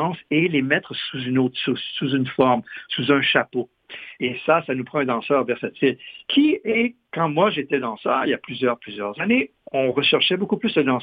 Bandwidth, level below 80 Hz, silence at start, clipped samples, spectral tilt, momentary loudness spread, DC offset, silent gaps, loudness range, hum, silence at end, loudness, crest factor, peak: 5 kHz; -64 dBFS; 0 s; under 0.1%; -8.5 dB/octave; 9 LU; under 0.1%; none; 1 LU; none; 0 s; -21 LUFS; 20 dB; -2 dBFS